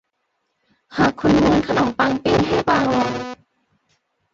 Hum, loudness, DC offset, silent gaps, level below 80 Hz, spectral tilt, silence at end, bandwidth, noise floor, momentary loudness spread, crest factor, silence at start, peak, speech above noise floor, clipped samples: none; -18 LUFS; under 0.1%; none; -42 dBFS; -6 dB/octave; 1 s; 7.6 kHz; -72 dBFS; 10 LU; 16 dB; 0.9 s; -4 dBFS; 55 dB; under 0.1%